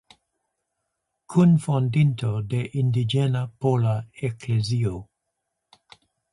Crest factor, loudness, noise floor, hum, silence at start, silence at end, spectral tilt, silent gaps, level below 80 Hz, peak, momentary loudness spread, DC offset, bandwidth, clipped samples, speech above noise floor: 16 dB; -23 LUFS; -80 dBFS; none; 1.3 s; 1.3 s; -7.5 dB/octave; none; -54 dBFS; -8 dBFS; 10 LU; under 0.1%; 11.5 kHz; under 0.1%; 58 dB